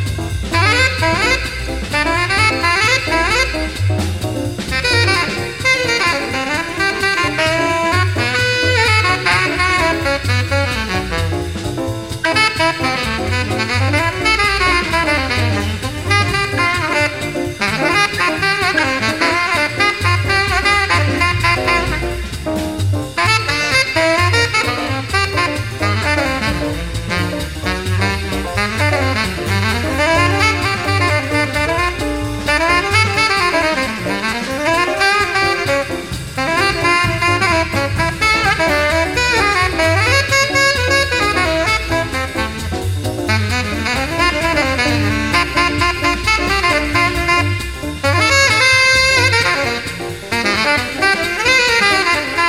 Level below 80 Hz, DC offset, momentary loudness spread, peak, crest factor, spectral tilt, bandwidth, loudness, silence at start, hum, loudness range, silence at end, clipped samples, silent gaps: -30 dBFS; 0.3%; 8 LU; 0 dBFS; 16 dB; -4 dB/octave; 16 kHz; -15 LUFS; 0 s; none; 4 LU; 0 s; under 0.1%; none